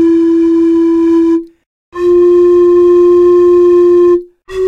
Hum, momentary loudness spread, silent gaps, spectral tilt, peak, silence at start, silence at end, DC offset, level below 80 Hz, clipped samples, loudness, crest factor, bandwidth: none; 8 LU; 1.66-1.92 s; -7.5 dB/octave; -2 dBFS; 0 s; 0 s; under 0.1%; -42 dBFS; under 0.1%; -8 LUFS; 6 dB; 4.5 kHz